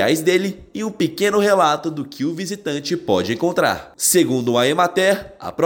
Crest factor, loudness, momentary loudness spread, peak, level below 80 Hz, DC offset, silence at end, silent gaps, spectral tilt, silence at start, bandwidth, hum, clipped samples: 16 dB; -19 LUFS; 10 LU; -4 dBFS; -56 dBFS; under 0.1%; 0 s; none; -4 dB/octave; 0 s; 17 kHz; none; under 0.1%